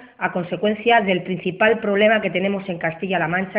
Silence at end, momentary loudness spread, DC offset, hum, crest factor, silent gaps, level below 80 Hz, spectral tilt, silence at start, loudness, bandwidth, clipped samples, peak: 0 s; 8 LU; under 0.1%; none; 16 dB; none; -60 dBFS; -10.5 dB/octave; 0 s; -20 LUFS; 5 kHz; under 0.1%; -4 dBFS